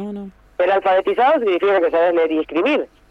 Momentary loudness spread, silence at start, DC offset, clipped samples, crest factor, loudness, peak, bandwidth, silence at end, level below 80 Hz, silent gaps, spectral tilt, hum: 9 LU; 0 s; under 0.1%; under 0.1%; 10 dB; -17 LUFS; -6 dBFS; 6.4 kHz; 0.25 s; -54 dBFS; none; -6.5 dB/octave; none